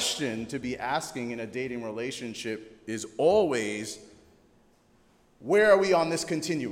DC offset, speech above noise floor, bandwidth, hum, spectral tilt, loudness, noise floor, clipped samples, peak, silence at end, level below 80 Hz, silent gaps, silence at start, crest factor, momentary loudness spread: under 0.1%; 35 dB; 16 kHz; none; -4 dB/octave; -28 LUFS; -62 dBFS; under 0.1%; -8 dBFS; 0 s; -62 dBFS; none; 0 s; 20 dB; 15 LU